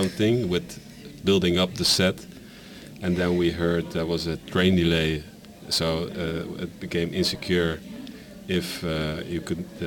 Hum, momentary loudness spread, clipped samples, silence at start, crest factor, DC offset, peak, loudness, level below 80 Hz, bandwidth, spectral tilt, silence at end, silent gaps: none; 20 LU; under 0.1%; 0 s; 20 dB; under 0.1%; -6 dBFS; -25 LUFS; -46 dBFS; 17.5 kHz; -5 dB/octave; 0 s; none